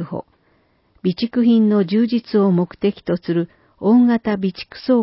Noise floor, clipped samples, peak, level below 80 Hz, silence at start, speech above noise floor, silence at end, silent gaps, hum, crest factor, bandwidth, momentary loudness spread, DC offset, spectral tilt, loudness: -60 dBFS; under 0.1%; -4 dBFS; -56 dBFS; 0 s; 43 dB; 0 s; none; none; 14 dB; 5.8 kHz; 11 LU; under 0.1%; -12 dB/octave; -18 LUFS